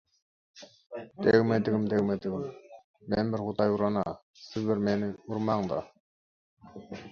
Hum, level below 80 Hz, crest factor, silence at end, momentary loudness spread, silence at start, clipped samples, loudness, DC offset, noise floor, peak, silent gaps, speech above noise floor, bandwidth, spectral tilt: none; -60 dBFS; 22 dB; 0 s; 20 LU; 0.55 s; under 0.1%; -29 LUFS; under 0.1%; under -90 dBFS; -8 dBFS; 2.84-2.94 s, 4.23-4.34 s, 6.00-6.57 s; over 61 dB; 6.8 kHz; -8 dB/octave